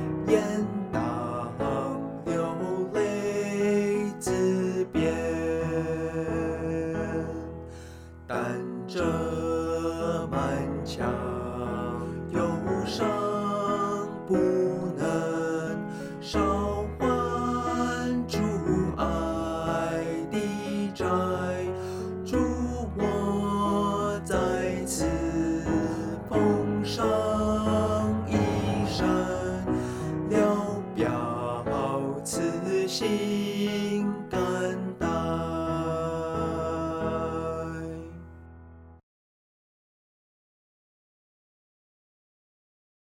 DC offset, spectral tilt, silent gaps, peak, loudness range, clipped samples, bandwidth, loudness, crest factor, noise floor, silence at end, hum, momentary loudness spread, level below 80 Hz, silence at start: under 0.1%; -6 dB/octave; none; -10 dBFS; 5 LU; under 0.1%; 16 kHz; -28 LUFS; 18 dB; -49 dBFS; 4.05 s; none; 7 LU; -46 dBFS; 0 s